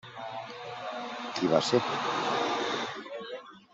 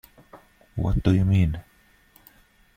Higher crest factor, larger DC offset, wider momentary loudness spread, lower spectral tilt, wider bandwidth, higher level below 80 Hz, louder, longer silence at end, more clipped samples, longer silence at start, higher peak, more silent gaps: about the same, 22 dB vs 18 dB; neither; about the same, 14 LU vs 16 LU; second, -4 dB/octave vs -8.5 dB/octave; second, 8.2 kHz vs 15 kHz; second, -72 dBFS vs -36 dBFS; second, -31 LUFS vs -23 LUFS; second, 0.15 s vs 1.15 s; neither; second, 0.05 s vs 0.35 s; about the same, -10 dBFS vs -8 dBFS; neither